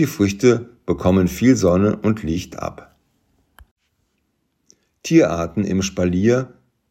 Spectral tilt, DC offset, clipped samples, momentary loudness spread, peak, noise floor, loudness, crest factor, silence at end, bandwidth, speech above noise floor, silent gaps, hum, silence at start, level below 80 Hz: -6.5 dB/octave; under 0.1%; under 0.1%; 13 LU; -2 dBFS; -69 dBFS; -18 LUFS; 18 dB; 0.45 s; 16 kHz; 52 dB; 3.71-3.77 s; none; 0 s; -46 dBFS